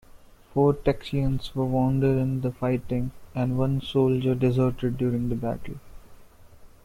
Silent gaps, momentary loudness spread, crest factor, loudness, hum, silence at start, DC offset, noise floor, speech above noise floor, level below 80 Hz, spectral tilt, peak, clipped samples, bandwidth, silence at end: none; 8 LU; 16 dB; -26 LUFS; none; 0.15 s; under 0.1%; -50 dBFS; 25 dB; -42 dBFS; -9 dB/octave; -10 dBFS; under 0.1%; 13 kHz; 0.15 s